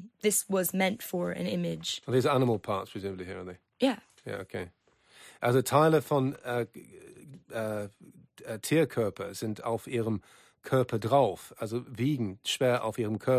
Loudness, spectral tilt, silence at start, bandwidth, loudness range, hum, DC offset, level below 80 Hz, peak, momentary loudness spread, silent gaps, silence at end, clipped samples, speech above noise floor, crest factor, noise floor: -30 LUFS; -5 dB/octave; 0 s; 15.5 kHz; 4 LU; none; under 0.1%; -64 dBFS; -10 dBFS; 15 LU; none; 0 s; under 0.1%; 28 dB; 20 dB; -58 dBFS